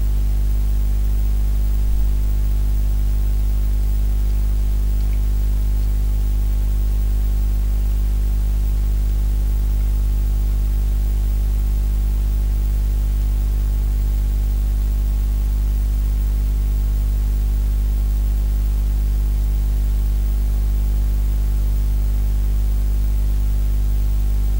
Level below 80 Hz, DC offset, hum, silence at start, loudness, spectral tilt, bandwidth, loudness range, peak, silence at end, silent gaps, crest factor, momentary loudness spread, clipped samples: -18 dBFS; under 0.1%; 50 Hz at -15 dBFS; 0 s; -21 LUFS; -7 dB/octave; 16 kHz; 0 LU; -8 dBFS; 0 s; none; 10 dB; 0 LU; under 0.1%